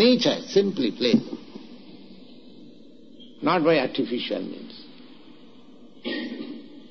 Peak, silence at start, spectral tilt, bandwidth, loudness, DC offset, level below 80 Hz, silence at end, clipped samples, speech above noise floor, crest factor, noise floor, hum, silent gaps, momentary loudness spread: -6 dBFS; 0 s; -3.5 dB/octave; 6.6 kHz; -24 LUFS; 0.4%; -66 dBFS; 0.05 s; under 0.1%; 27 dB; 20 dB; -50 dBFS; none; none; 25 LU